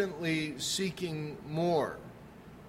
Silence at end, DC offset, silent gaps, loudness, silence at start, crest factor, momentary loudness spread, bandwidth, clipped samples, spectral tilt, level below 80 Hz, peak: 0 s; under 0.1%; none; -33 LUFS; 0 s; 18 dB; 19 LU; 16 kHz; under 0.1%; -4.5 dB/octave; -62 dBFS; -16 dBFS